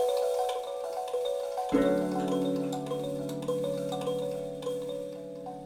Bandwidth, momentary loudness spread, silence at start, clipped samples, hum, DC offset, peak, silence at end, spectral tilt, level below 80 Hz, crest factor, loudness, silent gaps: 16.5 kHz; 8 LU; 0 s; under 0.1%; none; under 0.1%; -14 dBFS; 0 s; -6 dB/octave; -60 dBFS; 18 dB; -32 LUFS; none